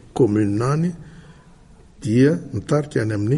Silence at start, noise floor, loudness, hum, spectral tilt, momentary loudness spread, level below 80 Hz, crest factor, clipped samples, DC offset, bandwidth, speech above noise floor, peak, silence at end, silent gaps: 0.15 s; -47 dBFS; -20 LUFS; none; -8 dB/octave; 9 LU; -50 dBFS; 16 dB; under 0.1%; under 0.1%; 11.5 kHz; 28 dB; -6 dBFS; 0 s; none